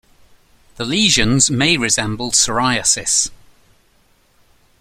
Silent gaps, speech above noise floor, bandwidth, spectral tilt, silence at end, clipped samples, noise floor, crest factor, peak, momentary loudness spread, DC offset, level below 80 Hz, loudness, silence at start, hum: none; 40 dB; 16 kHz; -2 dB/octave; 1.45 s; under 0.1%; -56 dBFS; 18 dB; 0 dBFS; 6 LU; under 0.1%; -40 dBFS; -14 LUFS; 0.8 s; none